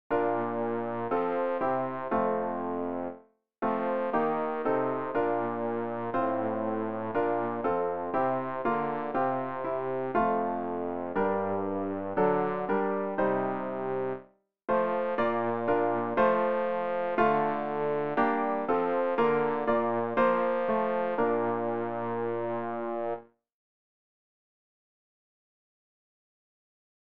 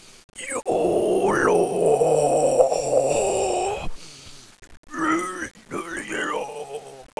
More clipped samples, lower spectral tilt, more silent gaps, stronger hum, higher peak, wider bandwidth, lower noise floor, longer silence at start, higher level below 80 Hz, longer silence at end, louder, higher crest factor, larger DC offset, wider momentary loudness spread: neither; first, -9.5 dB/octave vs -4 dB/octave; second, none vs 0.24-0.29 s, 4.77-4.83 s; neither; second, -12 dBFS vs -2 dBFS; second, 5 kHz vs 11 kHz; first, -56 dBFS vs -44 dBFS; about the same, 0.1 s vs 0.1 s; second, -64 dBFS vs -46 dBFS; first, 3.55 s vs 0.15 s; second, -29 LUFS vs -22 LUFS; about the same, 18 dB vs 22 dB; first, 0.4% vs under 0.1%; second, 6 LU vs 17 LU